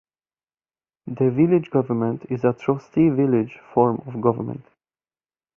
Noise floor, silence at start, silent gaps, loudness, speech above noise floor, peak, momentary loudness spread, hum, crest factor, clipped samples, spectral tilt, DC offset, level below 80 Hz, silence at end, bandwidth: under -90 dBFS; 1.05 s; none; -21 LUFS; over 69 dB; -4 dBFS; 12 LU; none; 18 dB; under 0.1%; -10.5 dB/octave; under 0.1%; -60 dBFS; 0.95 s; 6.6 kHz